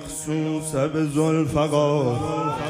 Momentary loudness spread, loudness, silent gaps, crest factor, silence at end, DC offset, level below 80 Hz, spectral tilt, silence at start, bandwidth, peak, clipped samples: 5 LU; -23 LUFS; none; 14 dB; 0 s; under 0.1%; -50 dBFS; -6 dB/octave; 0 s; 15.5 kHz; -8 dBFS; under 0.1%